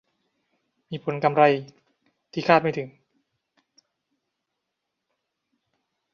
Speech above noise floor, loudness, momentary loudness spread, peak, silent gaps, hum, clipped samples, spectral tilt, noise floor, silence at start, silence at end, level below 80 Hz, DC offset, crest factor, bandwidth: 60 dB; -22 LUFS; 17 LU; -2 dBFS; none; none; under 0.1%; -7 dB/octave; -82 dBFS; 0.9 s; 3.25 s; -72 dBFS; under 0.1%; 26 dB; 7 kHz